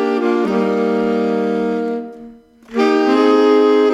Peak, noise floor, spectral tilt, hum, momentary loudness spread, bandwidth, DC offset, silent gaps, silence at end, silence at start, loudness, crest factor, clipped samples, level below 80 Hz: -2 dBFS; -39 dBFS; -6.5 dB/octave; none; 11 LU; 10 kHz; under 0.1%; none; 0 s; 0 s; -15 LUFS; 12 dB; under 0.1%; -58 dBFS